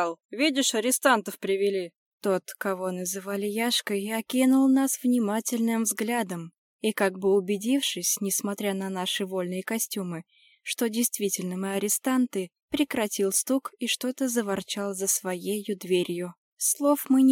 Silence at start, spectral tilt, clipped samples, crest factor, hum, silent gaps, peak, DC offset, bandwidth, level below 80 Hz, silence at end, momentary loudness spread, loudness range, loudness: 0 s; -3 dB/octave; under 0.1%; 18 dB; none; 0.25-0.29 s, 1.96-2.18 s, 6.58-6.79 s, 12.62-12.68 s, 16.38-16.57 s; -8 dBFS; under 0.1%; 17.5 kHz; -72 dBFS; 0 s; 9 LU; 4 LU; -26 LUFS